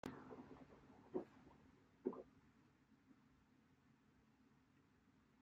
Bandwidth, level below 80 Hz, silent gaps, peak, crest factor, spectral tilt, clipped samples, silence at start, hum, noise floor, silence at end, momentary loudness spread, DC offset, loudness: 7.4 kHz; -82 dBFS; none; -30 dBFS; 28 dB; -6.5 dB/octave; under 0.1%; 0.05 s; none; -75 dBFS; 0 s; 16 LU; under 0.1%; -54 LUFS